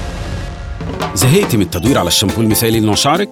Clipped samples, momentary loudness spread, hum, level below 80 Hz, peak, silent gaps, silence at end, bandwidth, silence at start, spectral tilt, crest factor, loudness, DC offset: under 0.1%; 13 LU; none; -30 dBFS; -2 dBFS; none; 0 s; 17.5 kHz; 0 s; -4.5 dB/octave; 12 dB; -13 LUFS; under 0.1%